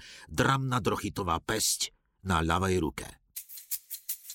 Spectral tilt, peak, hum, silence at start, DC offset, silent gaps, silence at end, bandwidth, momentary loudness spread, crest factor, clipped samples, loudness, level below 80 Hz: -4 dB/octave; -12 dBFS; none; 0 s; under 0.1%; none; 0 s; 17 kHz; 15 LU; 18 dB; under 0.1%; -30 LUFS; -48 dBFS